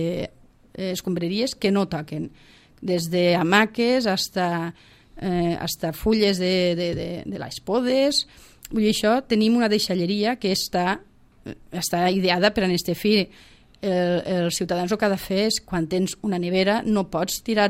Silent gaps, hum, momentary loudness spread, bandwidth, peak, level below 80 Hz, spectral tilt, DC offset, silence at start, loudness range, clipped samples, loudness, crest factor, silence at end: none; none; 12 LU; 16 kHz; -4 dBFS; -50 dBFS; -4.5 dB/octave; under 0.1%; 0 s; 2 LU; under 0.1%; -23 LUFS; 20 dB; 0 s